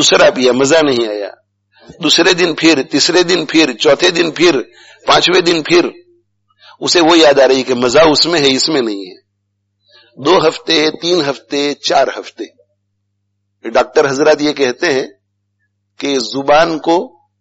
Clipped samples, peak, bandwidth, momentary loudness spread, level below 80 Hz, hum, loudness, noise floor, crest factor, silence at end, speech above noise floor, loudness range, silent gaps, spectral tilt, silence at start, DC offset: under 0.1%; 0 dBFS; 8.2 kHz; 13 LU; -48 dBFS; 50 Hz at -50 dBFS; -11 LUFS; -67 dBFS; 12 dB; 0.35 s; 56 dB; 5 LU; none; -3 dB/octave; 0 s; under 0.1%